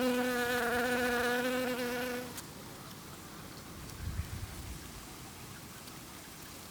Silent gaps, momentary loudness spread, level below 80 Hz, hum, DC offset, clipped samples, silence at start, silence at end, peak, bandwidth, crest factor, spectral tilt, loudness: none; 16 LU; -54 dBFS; none; under 0.1%; under 0.1%; 0 s; 0 s; -22 dBFS; over 20 kHz; 16 dB; -4 dB/octave; -36 LUFS